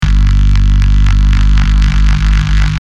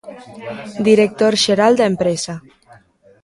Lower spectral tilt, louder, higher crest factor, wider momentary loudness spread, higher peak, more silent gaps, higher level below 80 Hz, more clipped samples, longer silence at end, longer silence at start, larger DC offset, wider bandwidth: first, -6 dB/octave vs -4.5 dB/octave; first, -11 LUFS vs -15 LUFS; second, 8 dB vs 16 dB; second, 1 LU vs 19 LU; about the same, 0 dBFS vs 0 dBFS; neither; first, -8 dBFS vs -56 dBFS; neither; second, 0.05 s vs 0.85 s; about the same, 0 s vs 0.05 s; neither; second, 7.4 kHz vs 11.5 kHz